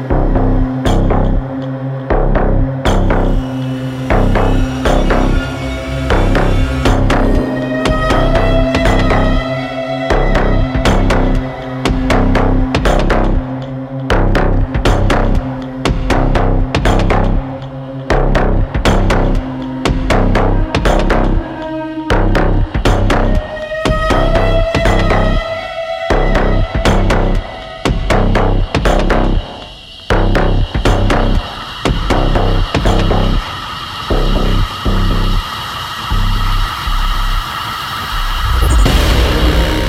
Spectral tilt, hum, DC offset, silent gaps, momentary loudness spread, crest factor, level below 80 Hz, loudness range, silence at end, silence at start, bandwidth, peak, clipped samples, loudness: -6 dB/octave; none; under 0.1%; none; 8 LU; 12 dB; -16 dBFS; 2 LU; 0 s; 0 s; 14 kHz; 0 dBFS; under 0.1%; -15 LUFS